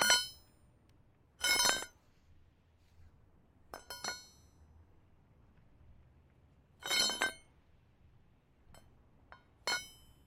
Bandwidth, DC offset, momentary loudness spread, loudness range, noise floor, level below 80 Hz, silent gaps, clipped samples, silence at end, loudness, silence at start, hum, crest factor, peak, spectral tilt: 16.5 kHz; under 0.1%; 24 LU; 14 LU; -67 dBFS; -66 dBFS; none; under 0.1%; 0.35 s; -33 LUFS; 0 s; none; 30 dB; -12 dBFS; 0.5 dB/octave